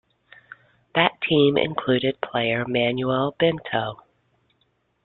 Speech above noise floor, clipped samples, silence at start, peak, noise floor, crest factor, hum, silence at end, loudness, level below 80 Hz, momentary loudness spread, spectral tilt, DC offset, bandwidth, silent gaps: 47 dB; under 0.1%; 0.95 s; -4 dBFS; -68 dBFS; 20 dB; none; 1.1 s; -22 LUFS; -58 dBFS; 8 LU; -9.5 dB/octave; under 0.1%; 4.3 kHz; none